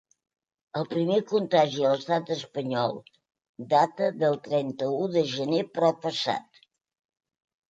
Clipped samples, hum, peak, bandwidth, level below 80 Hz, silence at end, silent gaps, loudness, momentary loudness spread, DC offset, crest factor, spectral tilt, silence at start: under 0.1%; none; -10 dBFS; 9 kHz; -74 dBFS; 1.3 s; 3.49-3.54 s; -26 LUFS; 8 LU; under 0.1%; 18 dB; -6 dB/octave; 0.75 s